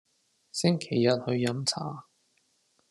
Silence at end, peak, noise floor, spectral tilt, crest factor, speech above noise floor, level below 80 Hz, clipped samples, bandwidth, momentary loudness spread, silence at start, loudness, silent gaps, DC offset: 0.9 s; -8 dBFS; -71 dBFS; -5 dB/octave; 22 dB; 43 dB; -72 dBFS; under 0.1%; 12.5 kHz; 12 LU; 0.55 s; -28 LUFS; none; under 0.1%